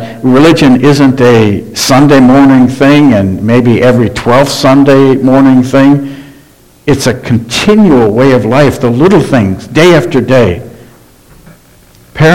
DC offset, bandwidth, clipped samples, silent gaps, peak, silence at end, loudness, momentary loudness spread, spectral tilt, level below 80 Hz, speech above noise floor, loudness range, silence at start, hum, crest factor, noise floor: 2%; 16 kHz; 7%; none; 0 dBFS; 0 s; -6 LUFS; 7 LU; -6 dB/octave; -34 dBFS; 34 dB; 3 LU; 0 s; none; 6 dB; -39 dBFS